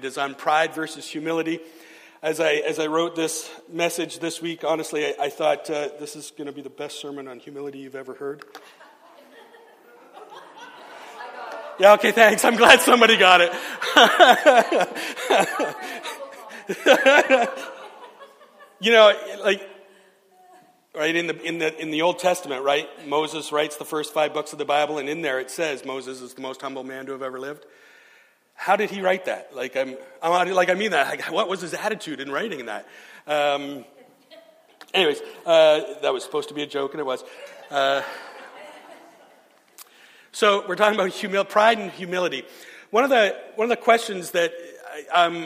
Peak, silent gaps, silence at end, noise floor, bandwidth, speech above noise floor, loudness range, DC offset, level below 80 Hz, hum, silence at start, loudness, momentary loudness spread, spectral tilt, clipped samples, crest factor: 0 dBFS; none; 0 s; -56 dBFS; 15.5 kHz; 35 dB; 14 LU; under 0.1%; -72 dBFS; none; 0 s; -20 LUFS; 21 LU; -2.5 dB/octave; under 0.1%; 22 dB